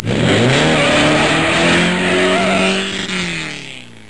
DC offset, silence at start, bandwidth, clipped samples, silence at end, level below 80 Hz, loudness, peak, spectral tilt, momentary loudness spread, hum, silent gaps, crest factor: 1%; 0 s; 11.5 kHz; under 0.1%; 0.2 s; -40 dBFS; -13 LUFS; 0 dBFS; -4.5 dB/octave; 10 LU; none; none; 14 dB